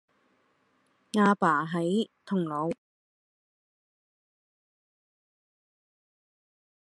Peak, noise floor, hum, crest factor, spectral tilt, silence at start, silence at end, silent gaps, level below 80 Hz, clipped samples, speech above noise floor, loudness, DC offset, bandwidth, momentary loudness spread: -10 dBFS; -70 dBFS; none; 24 dB; -6.5 dB/octave; 1.15 s; 4.15 s; none; -80 dBFS; under 0.1%; 43 dB; -28 LUFS; under 0.1%; 11.5 kHz; 10 LU